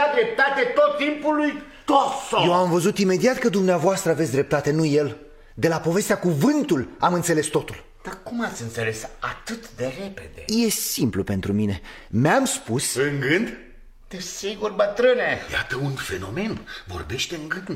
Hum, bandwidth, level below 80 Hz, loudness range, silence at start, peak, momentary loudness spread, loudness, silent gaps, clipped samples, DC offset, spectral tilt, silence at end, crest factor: none; 16.5 kHz; -48 dBFS; 6 LU; 0 s; -6 dBFS; 13 LU; -22 LUFS; none; under 0.1%; under 0.1%; -4.5 dB/octave; 0 s; 18 dB